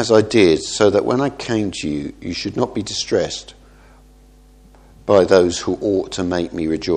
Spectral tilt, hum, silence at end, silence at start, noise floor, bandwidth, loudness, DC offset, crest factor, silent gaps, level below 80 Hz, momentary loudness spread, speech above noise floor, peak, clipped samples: -5 dB/octave; none; 0 s; 0 s; -47 dBFS; 10 kHz; -18 LUFS; under 0.1%; 18 dB; none; -46 dBFS; 12 LU; 30 dB; 0 dBFS; under 0.1%